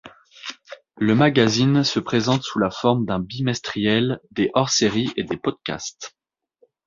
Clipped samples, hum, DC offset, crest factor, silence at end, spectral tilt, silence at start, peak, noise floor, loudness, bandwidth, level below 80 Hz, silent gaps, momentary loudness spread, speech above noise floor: under 0.1%; none; under 0.1%; 20 dB; 0.8 s; -5 dB/octave; 0.05 s; -2 dBFS; -62 dBFS; -21 LUFS; 7.6 kHz; -54 dBFS; none; 18 LU; 42 dB